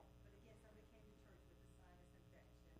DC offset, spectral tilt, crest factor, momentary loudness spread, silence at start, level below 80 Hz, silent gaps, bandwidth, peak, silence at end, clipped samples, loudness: under 0.1%; -6 dB/octave; 12 dB; 2 LU; 0 s; -70 dBFS; none; 15 kHz; -54 dBFS; 0 s; under 0.1%; -68 LUFS